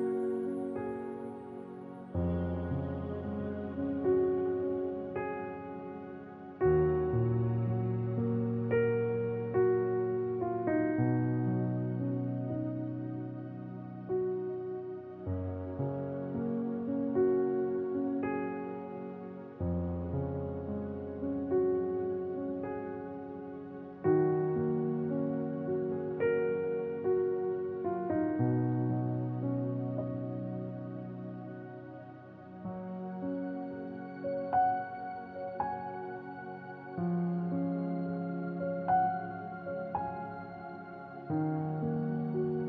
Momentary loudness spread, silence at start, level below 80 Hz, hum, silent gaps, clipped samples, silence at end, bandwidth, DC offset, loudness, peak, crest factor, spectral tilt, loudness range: 13 LU; 0 s; -54 dBFS; none; none; under 0.1%; 0 s; 4.7 kHz; under 0.1%; -34 LUFS; -16 dBFS; 16 dB; -11.5 dB/octave; 6 LU